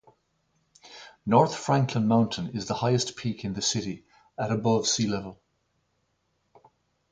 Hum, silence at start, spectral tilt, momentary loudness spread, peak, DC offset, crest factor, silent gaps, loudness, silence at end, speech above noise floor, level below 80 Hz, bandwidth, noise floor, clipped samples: none; 0.85 s; -5 dB/octave; 18 LU; -6 dBFS; under 0.1%; 22 dB; none; -26 LUFS; 1.75 s; 48 dB; -60 dBFS; 9.6 kHz; -74 dBFS; under 0.1%